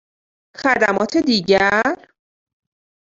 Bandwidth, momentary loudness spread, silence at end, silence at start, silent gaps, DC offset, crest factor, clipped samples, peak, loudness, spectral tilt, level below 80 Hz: 7.8 kHz; 8 LU; 1.05 s; 0.6 s; none; under 0.1%; 18 dB; under 0.1%; -2 dBFS; -17 LUFS; -4.5 dB/octave; -54 dBFS